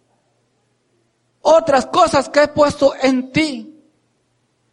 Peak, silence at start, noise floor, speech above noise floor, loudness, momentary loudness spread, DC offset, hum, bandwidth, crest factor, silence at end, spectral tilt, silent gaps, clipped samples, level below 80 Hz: -2 dBFS; 1.45 s; -64 dBFS; 49 dB; -15 LUFS; 7 LU; under 0.1%; none; 11.5 kHz; 16 dB; 1 s; -4.5 dB/octave; none; under 0.1%; -50 dBFS